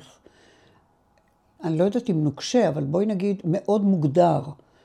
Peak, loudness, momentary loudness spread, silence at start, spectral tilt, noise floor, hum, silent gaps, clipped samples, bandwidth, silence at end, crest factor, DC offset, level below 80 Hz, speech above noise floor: -6 dBFS; -23 LUFS; 8 LU; 1.6 s; -7 dB/octave; -63 dBFS; none; none; under 0.1%; 10 kHz; 0.3 s; 18 dB; under 0.1%; -66 dBFS; 41 dB